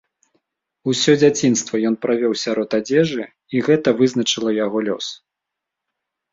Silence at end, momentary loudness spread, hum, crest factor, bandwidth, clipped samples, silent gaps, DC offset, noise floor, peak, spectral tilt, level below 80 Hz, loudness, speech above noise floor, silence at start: 1.2 s; 10 LU; none; 18 dB; 7.8 kHz; under 0.1%; none; under 0.1%; -83 dBFS; -2 dBFS; -4.5 dB/octave; -60 dBFS; -18 LUFS; 65 dB; 0.85 s